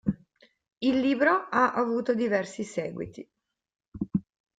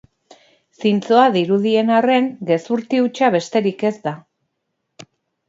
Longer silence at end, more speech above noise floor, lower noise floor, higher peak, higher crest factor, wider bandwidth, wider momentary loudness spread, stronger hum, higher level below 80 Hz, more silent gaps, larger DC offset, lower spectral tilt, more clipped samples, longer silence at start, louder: second, 0.35 s vs 1.3 s; second, 36 dB vs 58 dB; second, -62 dBFS vs -74 dBFS; second, -8 dBFS vs 0 dBFS; about the same, 20 dB vs 18 dB; first, 9.2 kHz vs 7.8 kHz; first, 15 LU vs 8 LU; neither; first, -60 dBFS vs -70 dBFS; first, 3.88-3.92 s vs none; neither; about the same, -6 dB/octave vs -6 dB/octave; neither; second, 0.05 s vs 0.8 s; second, -27 LUFS vs -17 LUFS